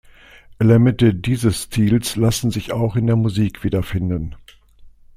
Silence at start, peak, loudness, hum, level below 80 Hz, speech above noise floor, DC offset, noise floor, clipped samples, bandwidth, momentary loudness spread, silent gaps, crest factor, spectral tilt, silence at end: 0.5 s; -2 dBFS; -18 LUFS; none; -40 dBFS; 27 dB; under 0.1%; -45 dBFS; under 0.1%; 15.5 kHz; 9 LU; none; 16 dB; -6.5 dB/octave; 0.3 s